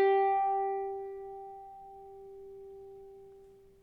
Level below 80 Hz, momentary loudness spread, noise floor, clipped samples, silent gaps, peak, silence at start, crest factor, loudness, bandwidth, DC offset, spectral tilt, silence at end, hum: -68 dBFS; 23 LU; -57 dBFS; under 0.1%; none; -18 dBFS; 0 s; 16 dB; -32 LUFS; 4.6 kHz; under 0.1%; -6.5 dB/octave; 0.35 s; none